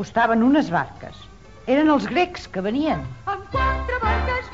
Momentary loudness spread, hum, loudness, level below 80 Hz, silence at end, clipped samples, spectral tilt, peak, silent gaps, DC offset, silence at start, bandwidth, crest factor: 12 LU; none; -21 LUFS; -34 dBFS; 0 s; under 0.1%; -7 dB/octave; -6 dBFS; none; 0.3%; 0 s; 7.8 kHz; 16 dB